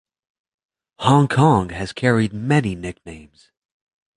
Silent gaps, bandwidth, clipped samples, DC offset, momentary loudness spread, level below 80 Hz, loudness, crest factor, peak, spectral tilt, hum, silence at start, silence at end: none; 11 kHz; under 0.1%; under 0.1%; 16 LU; -46 dBFS; -18 LUFS; 18 dB; -2 dBFS; -6.5 dB/octave; none; 1 s; 0.95 s